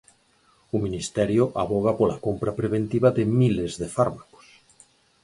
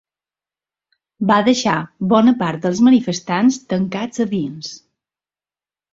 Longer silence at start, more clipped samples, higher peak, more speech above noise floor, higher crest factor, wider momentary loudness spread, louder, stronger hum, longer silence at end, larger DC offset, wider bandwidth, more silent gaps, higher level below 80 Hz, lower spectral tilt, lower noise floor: second, 0.75 s vs 1.2 s; neither; second, -6 dBFS vs -2 dBFS; second, 39 dB vs over 74 dB; about the same, 18 dB vs 16 dB; second, 7 LU vs 10 LU; second, -24 LUFS vs -17 LUFS; neither; second, 1 s vs 1.15 s; neither; first, 11.5 kHz vs 7.8 kHz; neither; first, -50 dBFS vs -58 dBFS; first, -7 dB/octave vs -5.5 dB/octave; second, -62 dBFS vs under -90 dBFS